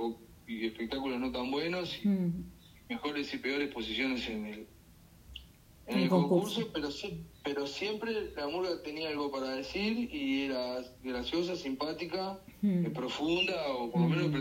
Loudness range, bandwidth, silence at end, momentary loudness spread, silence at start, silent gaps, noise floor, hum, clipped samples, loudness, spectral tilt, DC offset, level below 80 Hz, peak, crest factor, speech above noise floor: 3 LU; 16 kHz; 0 s; 12 LU; 0 s; none; -58 dBFS; none; under 0.1%; -34 LUFS; -6 dB/octave; under 0.1%; -60 dBFS; -16 dBFS; 18 dB; 24 dB